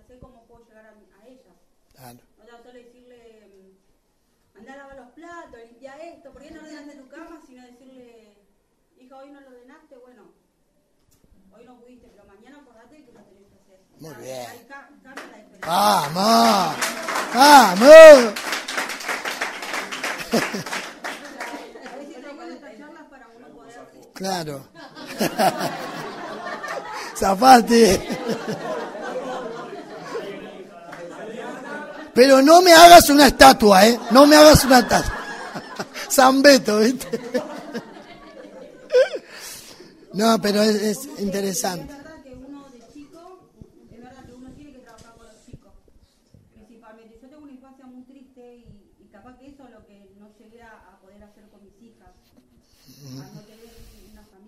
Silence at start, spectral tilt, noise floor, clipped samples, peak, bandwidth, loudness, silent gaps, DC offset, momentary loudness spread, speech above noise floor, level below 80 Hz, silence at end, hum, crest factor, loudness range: 5.35 s; -3.5 dB/octave; -66 dBFS; 0.1%; 0 dBFS; 16 kHz; -14 LUFS; none; under 0.1%; 26 LU; 50 dB; -44 dBFS; 1.25 s; none; 20 dB; 21 LU